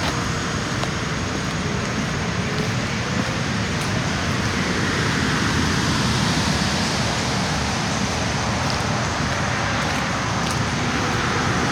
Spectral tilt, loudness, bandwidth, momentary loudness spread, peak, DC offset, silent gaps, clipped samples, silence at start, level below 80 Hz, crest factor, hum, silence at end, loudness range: -4 dB/octave; -21 LUFS; 17.5 kHz; 4 LU; -6 dBFS; under 0.1%; none; under 0.1%; 0 s; -36 dBFS; 16 dB; none; 0 s; 3 LU